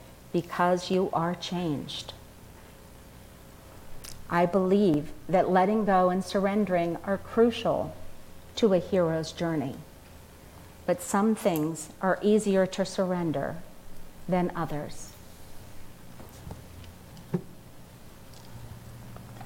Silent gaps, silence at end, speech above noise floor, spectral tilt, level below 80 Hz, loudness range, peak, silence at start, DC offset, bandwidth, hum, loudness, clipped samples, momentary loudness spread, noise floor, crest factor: none; 0 s; 23 dB; -6 dB/octave; -52 dBFS; 16 LU; -10 dBFS; 0 s; under 0.1%; 16.5 kHz; none; -27 LUFS; under 0.1%; 24 LU; -49 dBFS; 18 dB